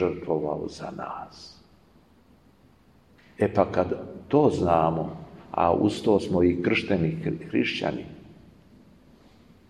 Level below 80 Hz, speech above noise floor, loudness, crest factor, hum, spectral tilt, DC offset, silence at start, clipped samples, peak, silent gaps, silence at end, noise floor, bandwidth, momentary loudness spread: -54 dBFS; 33 dB; -25 LUFS; 22 dB; none; -7 dB/octave; under 0.1%; 0 s; under 0.1%; -4 dBFS; none; 1.35 s; -58 dBFS; 11 kHz; 15 LU